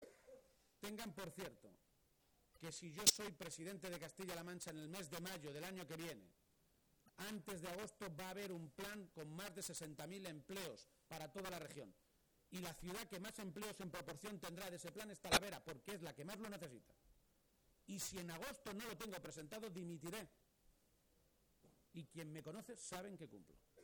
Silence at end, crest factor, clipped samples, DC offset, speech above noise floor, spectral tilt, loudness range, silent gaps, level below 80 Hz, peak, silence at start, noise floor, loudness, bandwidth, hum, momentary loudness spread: 0 s; 38 dB; under 0.1%; under 0.1%; 29 dB; -2.5 dB/octave; 11 LU; none; -74 dBFS; -14 dBFS; 0 s; -79 dBFS; -48 LUFS; over 20 kHz; none; 9 LU